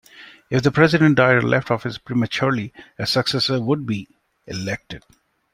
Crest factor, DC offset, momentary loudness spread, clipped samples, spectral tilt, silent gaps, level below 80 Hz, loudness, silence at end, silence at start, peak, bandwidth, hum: 18 dB; under 0.1%; 15 LU; under 0.1%; -6 dB/octave; none; -54 dBFS; -20 LUFS; 0.55 s; 0.15 s; -2 dBFS; 16 kHz; none